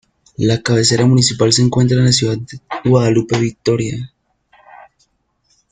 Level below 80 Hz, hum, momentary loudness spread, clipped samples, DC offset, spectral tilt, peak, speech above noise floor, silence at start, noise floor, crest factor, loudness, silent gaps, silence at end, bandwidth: -46 dBFS; none; 13 LU; under 0.1%; under 0.1%; -5 dB/octave; 0 dBFS; 48 dB; 0.4 s; -62 dBFS; 16 dB; -14 LUFS; none; 1.65 s; 9.6 kHz